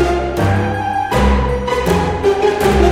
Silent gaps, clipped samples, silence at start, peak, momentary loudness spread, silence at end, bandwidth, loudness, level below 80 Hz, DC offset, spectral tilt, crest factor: none; under 0.1%; 0 s; 0 dBFS; 4 LU; 0 s; 16 kHz; -15 LUFS; -22 dBFS; under 0.1%; -6.5 dB/octave; 14 dB